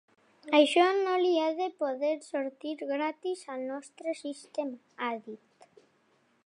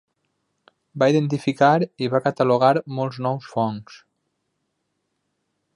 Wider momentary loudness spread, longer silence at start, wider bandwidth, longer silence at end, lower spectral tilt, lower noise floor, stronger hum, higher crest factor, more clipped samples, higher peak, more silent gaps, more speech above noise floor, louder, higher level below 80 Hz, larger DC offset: first, 14 LU vs 9 LU; second, 0.45 s vs 0.95 s; about the same, 11 kHz vs 11 kHz; second, 1.1 s vs 1.8 s; second, -2.5 dB/octave vs -7 dB/octave; second, -69 dBFS vs -75 dBFS; neither; about the same, 22 dB vs 20 dB; neither; second, -10 dBFS vs -4 dBFS; neither; second, 39 dB vs 55 dB; second, -30 LUFS vs -21 LUFS; second, -88 dBFS vs -68 dBFS; neither